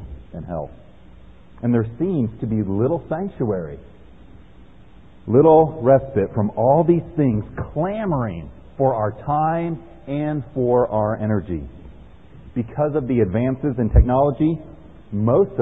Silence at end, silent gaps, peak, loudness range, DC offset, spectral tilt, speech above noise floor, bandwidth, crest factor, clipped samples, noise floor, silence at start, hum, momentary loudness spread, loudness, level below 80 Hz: 0 s; none; -2 dBFS; 6 LU; 0.5%; -12.5 dB/octave; 28 dB; 3.9 kHz; 18 dB; under 0.1%; -47 dBFS; 0 s; none; 15 LU; -20 LUFS; -32 dBFS